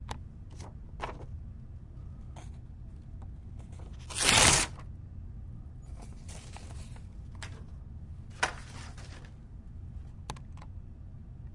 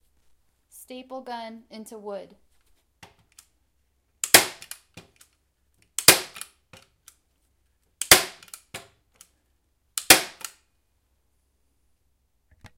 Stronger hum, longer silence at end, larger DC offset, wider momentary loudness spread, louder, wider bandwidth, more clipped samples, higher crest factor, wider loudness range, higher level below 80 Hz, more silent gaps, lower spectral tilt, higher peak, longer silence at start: neither; second, 0 s vs 2.5 s; neither; second, 21 LU vs 26 LU; second, -26 LUFS vs -18 LUFS; second, 11.5 kHz vs 16.5 kHz; neither; about the same, 30 dB vs 28 dB; about the same, 17 LU vs 19 LU; first, -46 dBFS vs -58 dBFS; neither; first, -2 dB/octave vs 0 dB/octave; second, -8 dBFS vs 0 dBFS; second, 0 s vs 0.9 s